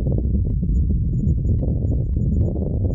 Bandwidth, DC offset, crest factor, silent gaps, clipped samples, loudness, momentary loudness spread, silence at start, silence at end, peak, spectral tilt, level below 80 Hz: 1.1 kHz; under 0.1%; 12 dB; none; under 0.1%; -21 LUFS; 1 LU; 0 s; 0 s; -6 dBFS; -14 dB/octave; -22 dBFS